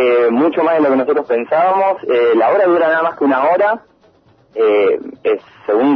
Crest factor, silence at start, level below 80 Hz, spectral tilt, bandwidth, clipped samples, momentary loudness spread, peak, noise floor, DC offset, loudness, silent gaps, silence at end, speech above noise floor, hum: 10 dB; 0 s; -64 dBFS; -8 dB/octave; 5.4 kHz; under 0.1%; 7 LU; -4 dBFS; -51 dBFS; under 0.1%; -14 LUFS; none; 0 s; 38 dB; none